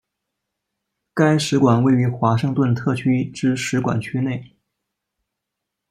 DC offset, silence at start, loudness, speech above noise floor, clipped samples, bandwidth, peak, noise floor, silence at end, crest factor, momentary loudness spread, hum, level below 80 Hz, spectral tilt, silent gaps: under 0.1%; 1.15 s; -19 LUFS; 63 dB; under 0.1%; 13.5 kHz; -4 dBFS; -81 dBFS; 1.45 s; 16 dB; 8 LU; none; -58 dBFS; -6.5 dB/octave; none